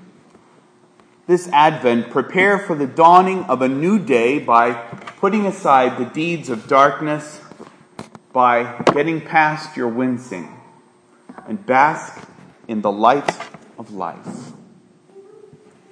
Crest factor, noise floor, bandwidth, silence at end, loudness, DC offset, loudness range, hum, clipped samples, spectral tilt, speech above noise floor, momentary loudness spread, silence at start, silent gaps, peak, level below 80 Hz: 18 dB; -52 dBFS; 10.5 kHz; 0.7 s; -17 LUFS; under 0.1%; 7 LU; none; under 0.1%; -6 dB/octave; 36 dB; 20 LU; 1.3 s; none; 0 dBFS; -68 dBFS